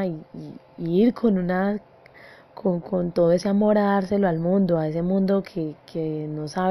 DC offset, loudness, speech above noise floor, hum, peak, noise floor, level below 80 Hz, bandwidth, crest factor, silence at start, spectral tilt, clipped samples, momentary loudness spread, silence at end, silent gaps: under 0.1%; -23 LUFS; 26 dB; none; -8 dBFS; -48 dBFS; -54 dBFS; 11.5 kHz; 14 dB; 0 s; -8.5 dB/octave; under 0.1%; 12 LU; 0 s; none